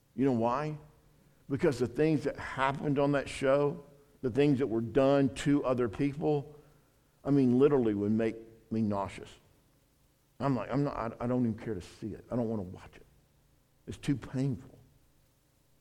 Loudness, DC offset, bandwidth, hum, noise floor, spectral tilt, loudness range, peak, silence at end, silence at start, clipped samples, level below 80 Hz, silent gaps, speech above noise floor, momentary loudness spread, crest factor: -31 LUFS; under 0.1%; 11.5 kHz; none; -69 dBFS; -7.5 dB/octave; 8 LU; -12 dBFS; 1.1 s; 0.15 s; under 0.1%; -58 dBFS; none; 38 dB; 16 LU; 20 dB